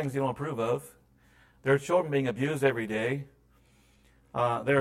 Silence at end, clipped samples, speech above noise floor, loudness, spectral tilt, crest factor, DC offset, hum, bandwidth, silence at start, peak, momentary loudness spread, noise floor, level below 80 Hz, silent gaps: 0 s; under 0.1%; 34 dB; -29 LUFS; -6.5 dB/octave; 18 dB; under 0.1%; none; 15.5 kHz; 0 s; -10 dBFS; 9 LU; -63 dBFS; -64 dBFS; none